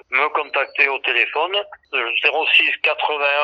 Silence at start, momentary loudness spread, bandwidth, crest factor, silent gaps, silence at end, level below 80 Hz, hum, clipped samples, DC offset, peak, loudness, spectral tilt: 0.1 s; 8 LU; 8.4 kHz; 18 dB; none; 0 s; -72 dBFS; none; under 0.1%; under 0.1%; -2 dBFS; -17 LUFS; -1.5 dB/octave